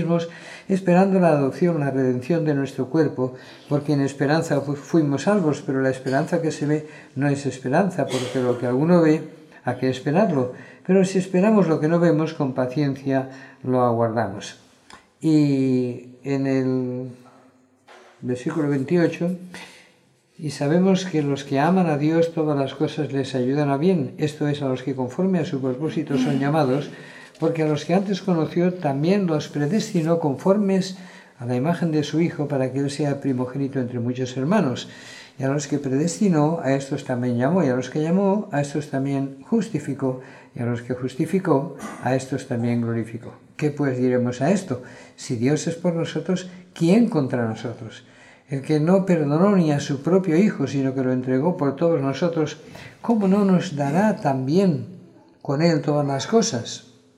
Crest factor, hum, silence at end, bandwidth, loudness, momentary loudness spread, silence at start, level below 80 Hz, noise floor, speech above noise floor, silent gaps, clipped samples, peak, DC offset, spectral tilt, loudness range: 18 dB; none; 0.4 s; 12 kHz; -22 LUFS; 12 LU; 0 s; -68 dBFS; -59 dBFS; 37 dB; none; under 0.1%; -4 dBFS; under 0.1%; -7 dB/octave; 4 LU